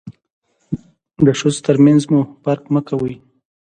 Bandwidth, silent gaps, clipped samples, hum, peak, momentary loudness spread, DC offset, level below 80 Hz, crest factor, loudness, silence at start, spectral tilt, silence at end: 9.4 kHz; 0.33-0.42 s; under 0.1%; none; 0 dBFS; 17 LU; under 0.1%; -52 dBFS; 16 dB; -16 LUFS; 0.05 s; -7 dB/octave; 0.45 s